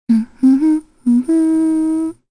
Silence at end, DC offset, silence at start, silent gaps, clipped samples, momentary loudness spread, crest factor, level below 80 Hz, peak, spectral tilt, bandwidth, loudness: 0.2 s; under 0.1%; 0.1 s; none; under 0.1%; 6 LU; 10 dB; -52 dBFS; -4 dBFS; -7.5 dB/octave; 10.5 kHz; -15 LUFS